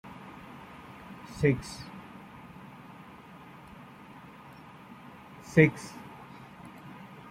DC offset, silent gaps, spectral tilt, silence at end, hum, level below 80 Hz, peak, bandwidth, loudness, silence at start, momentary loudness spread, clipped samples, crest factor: under 0.1%; none; -7 dB/octave; 0 s; none; -60 dBFS; -6 dBFS; 15 kHz; -27 LUFS; 0.05 s; 23 LU; under 0.1%; 28 dB